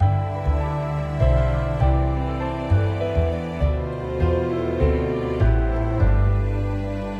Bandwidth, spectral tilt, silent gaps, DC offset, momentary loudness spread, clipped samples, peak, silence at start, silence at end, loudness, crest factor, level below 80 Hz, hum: 7.6 kHz; -9 dB/octave; none; under 0.1%; 5 LU; under 0.1%; -6 dBFS; 0 s; 0 s; -22 LUFS; 14 dB; -24 dBFS; none